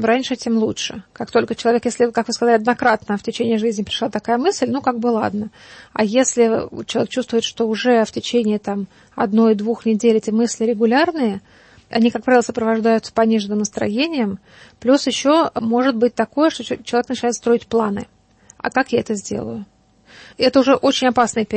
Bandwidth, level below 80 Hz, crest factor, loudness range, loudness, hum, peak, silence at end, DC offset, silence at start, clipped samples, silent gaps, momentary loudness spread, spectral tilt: 8.8 kHz; -56 dBFS; 16 dB; 3 LU; -18 LUFS; none; -2 dBFS; 0 s; under 0.1%; 0 s; under 0.1%; none; 9 LU; -4 dB/octave